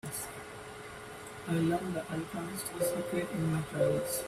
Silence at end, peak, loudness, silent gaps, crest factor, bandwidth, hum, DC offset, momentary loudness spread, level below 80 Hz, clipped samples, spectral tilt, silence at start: 0 s; -18 dBFS; -34 LUFS; none; 16 dB; 16 kHz; none; under 0.1%; 14 LU; -62 dBFS; under 0.1%; -5.5 dB/octave; 0.05 s